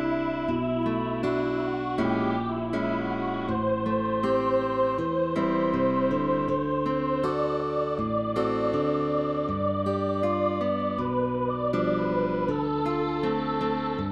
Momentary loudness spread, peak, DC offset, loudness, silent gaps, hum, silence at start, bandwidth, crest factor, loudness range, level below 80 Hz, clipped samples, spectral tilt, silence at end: 3 LU; -14 dBFS; 0.2%; -27 LUFS; none; none; 0 s; 9.2 kHz; 12 dB; 2 LU; -52 dBFS; under 0.1%; -8.5 dB/octave; 0 s